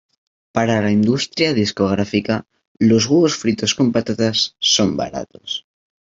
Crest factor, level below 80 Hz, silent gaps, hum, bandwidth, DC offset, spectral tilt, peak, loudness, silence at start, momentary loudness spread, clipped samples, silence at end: 18 dB; -54 dBFS; 2.68-2.75 s; none; 7.8 kHz; under 0.1%; -4.5 dB/octave; 0 dBFS; -18 LUFS; 0.55 s; 11 LU; under 0.1%; 0.55 s